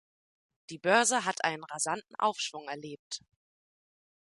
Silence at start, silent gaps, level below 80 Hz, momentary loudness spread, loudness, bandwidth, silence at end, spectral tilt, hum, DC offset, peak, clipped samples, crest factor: 0.7 s; 2.99-3.11 s; -80 dBFS; 17 LU; -30 LUFS; 11.5 kHz; 1.15 s; -1.5 dB/octave; none; under 0.1%; -10 dBFS; under 0.1%; 24 dB